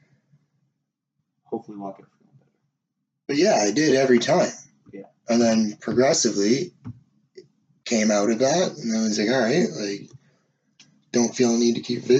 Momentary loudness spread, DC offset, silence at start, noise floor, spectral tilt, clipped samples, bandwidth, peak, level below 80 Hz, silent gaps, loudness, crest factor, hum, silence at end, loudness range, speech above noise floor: 18 LU; under 0.1%; 1.5 s; -79 dBFS; -4 dB/octave; under 0.1%; 8.6 kHz; -6 dBFS; -70 dBFS; none; -21 LUFS; 18 dB; none; 0 s; 5 LU; 58 dB